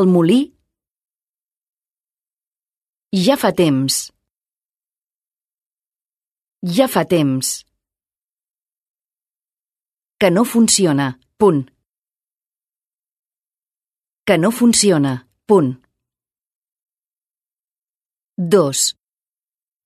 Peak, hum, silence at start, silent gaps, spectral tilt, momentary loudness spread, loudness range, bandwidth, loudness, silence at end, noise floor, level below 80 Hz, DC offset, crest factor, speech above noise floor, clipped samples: 0 dBFS; none; 0 s; 2.47-2.51 s, 5.06-5.10 s, 6.48-6.52 s, 8.90-8.94 s, 12.46-12.50 s, 13.19-13.23 s, 16.55-16.62 s, 16.72-16.76 s; -4.5 dB/octave; 15 LU; 6 LU; 13.5 kHz; -16 LUFS; 0.95 s; under -90 dBFS; -60 dBFS; under 0.1%; 20 dB; over 75 dB; under 0.1%